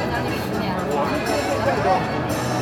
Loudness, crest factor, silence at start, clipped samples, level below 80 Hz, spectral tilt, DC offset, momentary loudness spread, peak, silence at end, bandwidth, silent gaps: -22 LUFS; 14 dB; 0 s; under 0.1%; -42 dBFS; -5.5 dB/octave; under 0.1%; 4 LU; -6 dBFS; 0 s; 17.5 kHz; none